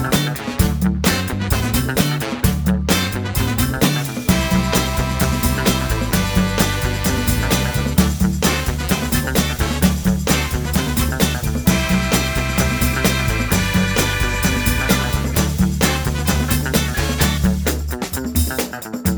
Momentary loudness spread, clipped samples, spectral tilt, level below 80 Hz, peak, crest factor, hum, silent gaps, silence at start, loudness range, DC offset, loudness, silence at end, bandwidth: 3 LU; under 0.1%; -4.5 dB/octave; -24 dBFS; 0 dBFS; 18 dB; none; none; 0 s; 1 LU; under 0.1%; -18 LUFS; 0 s; over 20 kHz